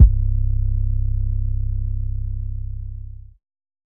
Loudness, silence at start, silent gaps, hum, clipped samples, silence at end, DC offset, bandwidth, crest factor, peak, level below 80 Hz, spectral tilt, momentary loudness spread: -24 LUFS; 0 s; none; none; under 0.1%; 0.7 s; under 0.1%; 0.7 kHz; 18 dB; 0 dBFS; -20 dBFS; -15.5 dB/octave; 12 LU